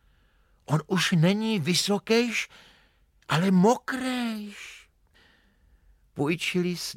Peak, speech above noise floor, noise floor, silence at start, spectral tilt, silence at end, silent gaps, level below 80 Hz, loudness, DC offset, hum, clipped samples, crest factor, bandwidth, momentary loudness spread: -10 dBFS; 38 dB; -63 dBFS; 0.7 s; -5 dB/octave; 0.05 s; none; -64 dBFS; -25 LUFS; under 0.1%; none; under 0.1%; 16 dB; 16.5 kHz; 15 LU